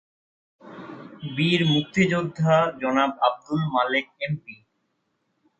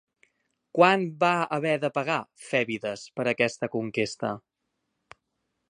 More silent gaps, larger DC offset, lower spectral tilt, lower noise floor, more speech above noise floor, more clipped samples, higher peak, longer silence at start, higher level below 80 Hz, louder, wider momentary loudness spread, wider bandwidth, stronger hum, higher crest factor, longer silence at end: neither; neither; first, -6.5 dB/octave vs -5 dB/octave; second, -73 dBFS vs -80 dBFS; about the same, 51 dB vs 54 dB; neither; about the same, -6 dBFS vs -4 dBFS; about the same, 0.65 s vs 0.75 s; first, -62 dBFS vs -72 dBFS; first, -23 LUFS vs -26 LUFS; first, 18 LU vs 12 LU; second, 8.4 kHz vs 11 kHz; neither; about the same, 20 dB vs 24 dB; second, 1.05 s vs 1.3 s